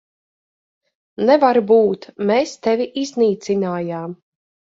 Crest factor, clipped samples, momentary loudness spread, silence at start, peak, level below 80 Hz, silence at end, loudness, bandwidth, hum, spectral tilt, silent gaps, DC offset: 18 dB; under 0.1%; 11 LU; 1.2 s; 0 dBFS; -64 dBFS; 0.55 s; -18 LUFS; 7.8 kHz; none; -6 dB/octave; none; under 0.1%